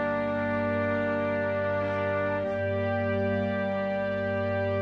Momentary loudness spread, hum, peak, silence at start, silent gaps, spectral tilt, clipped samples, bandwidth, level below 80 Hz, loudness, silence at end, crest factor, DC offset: 2 LU; 50 Hz at -60 dBFS; -14 dBFS; 0 s; none; -8.5 dB/octave; under 0.1%; 6.2 kHz; -60 dBFS; -28 LUFS; 0 s; 12 dB; under 0.1%